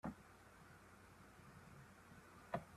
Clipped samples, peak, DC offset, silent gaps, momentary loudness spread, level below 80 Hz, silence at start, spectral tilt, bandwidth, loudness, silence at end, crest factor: under 0.1%; -30 dBFS; under 0.1%; none; 13 LU; -74 dBFS; 0.05 s; -6 dB/octave; 14.5 kHz; -59 LUFS; 0 s; 26 dB